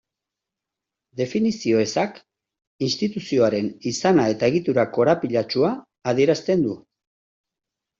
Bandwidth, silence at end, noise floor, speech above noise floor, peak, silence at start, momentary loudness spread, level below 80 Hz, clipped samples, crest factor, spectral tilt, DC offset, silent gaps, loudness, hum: 7.8 kHz; 1.2 s; -86 dBFS; 65 dB; -4 dBFS; 1.15 s; 9 LU; -62 dBFS; under 0.1%; 18 dB; -5.5 dB/octave; under 0.1%; 2.67-2.79 s; -22 LUFS; none